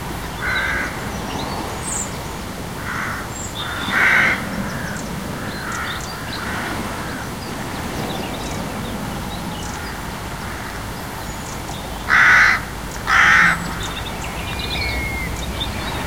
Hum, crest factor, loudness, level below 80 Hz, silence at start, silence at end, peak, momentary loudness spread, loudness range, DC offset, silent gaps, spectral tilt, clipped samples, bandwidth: none; 20 dB; -20 LUFS; -36 dBFS; 0 s; 0 s; 0 dBFS; 15 LU; 11 LU; 0.4%; none; -3.5 dB/octave; under 0.1%; 16.5 kHz